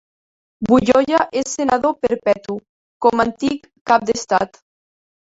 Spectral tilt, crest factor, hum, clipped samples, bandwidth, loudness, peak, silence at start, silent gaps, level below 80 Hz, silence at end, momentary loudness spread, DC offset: -4.5 dB/octave; 18 dB; none; under 0.1%; 8 kHz; -18 LUFS; -2 dBFS; 0.6 s; 2.69-3.00 s, 3.81-3.85 s; -50 dBFS; 0.95 s; 13 LU; under 0.1%